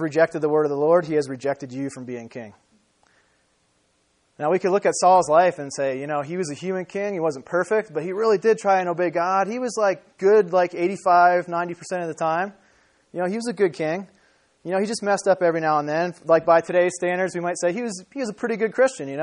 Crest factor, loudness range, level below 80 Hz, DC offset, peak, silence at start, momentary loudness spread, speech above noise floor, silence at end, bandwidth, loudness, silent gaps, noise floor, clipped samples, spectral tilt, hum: 18 dB; 6 LU; -70 dBFS; under 0.1%; -4 dBFS; 0 s; 12 LU; 45 dB; 0 s; 10.5 kHz; -22 LUFS; none; -66 dBFS; under 0.1%; -5 dB/octave; none